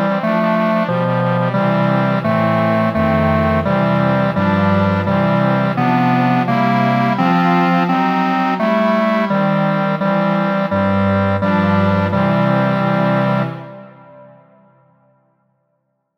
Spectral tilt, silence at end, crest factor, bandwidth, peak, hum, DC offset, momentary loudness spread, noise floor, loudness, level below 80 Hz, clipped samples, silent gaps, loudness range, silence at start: -8.5 dB/octave; 1.95 s; 12 dB; 6.6 kHz; -2 dBFS; none; under 0.1%; 2 LU; -68 dBFS; -15 LUFS; -48 dBFS; under 0.1%; none; 3 LU; 0 s